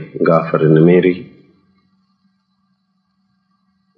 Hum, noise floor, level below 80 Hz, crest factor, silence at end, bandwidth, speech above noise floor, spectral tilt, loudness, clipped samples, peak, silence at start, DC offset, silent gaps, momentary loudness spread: none; -65 dBFS; -64 dBFS; 16 dB; 2.75 s; 5 kHz; 53 dB; -11 dB/octave; -13 LUFS; under 0.1%; 0 dBFS; 0 s; under 0.1%; none; 8 LU